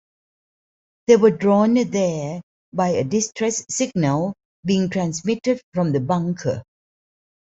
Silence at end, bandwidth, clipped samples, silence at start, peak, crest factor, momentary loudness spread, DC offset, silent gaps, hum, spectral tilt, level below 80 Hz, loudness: 0.95 s; 8.2 kHz; under 0.1%; 1.1 s; -2 dBFS; 20 dB; 13 LU; under 0.1%; 2.43-2.72 s, 4.45-4.63 s, 5.63-5.72 s; none; -5.5 dB/octave; -60 dBFS; -21 LUFS